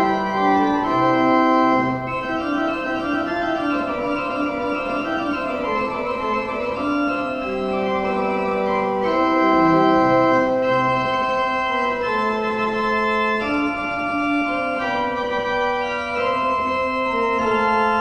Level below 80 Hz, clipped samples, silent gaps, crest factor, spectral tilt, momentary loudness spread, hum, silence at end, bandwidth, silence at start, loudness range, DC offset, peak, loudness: -48 dBFS; under 0.1%; none; 16 dB; -6 dB/octave; 7 LU; none; 0 s; 8.8 kHz; 0 s; 5 LU; under 0.1%; -4 dBFS; -20 LUFS